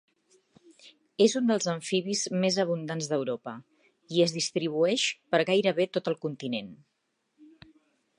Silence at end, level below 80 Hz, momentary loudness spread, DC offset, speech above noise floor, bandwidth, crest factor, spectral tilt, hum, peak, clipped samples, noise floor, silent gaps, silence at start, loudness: 0.75 s; -78 dBFS; 10 LU; under 0.1%; 50 dB; 11 kHz; 20 dB; -4 dB/octave; none; -10 dBFS; under 0.1%; -78 dBFS; none; 0.85 s; -28 LUFS